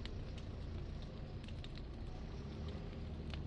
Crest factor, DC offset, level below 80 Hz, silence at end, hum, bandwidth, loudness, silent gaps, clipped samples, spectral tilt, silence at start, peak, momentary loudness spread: 18 dB; under 0.1%; -50 dBFS; 0 s; none; 9.2 kHz; -49 LUFS; none; under 0.1%; -7 dB/octave; 0 s; -28 dBFS; 2 LU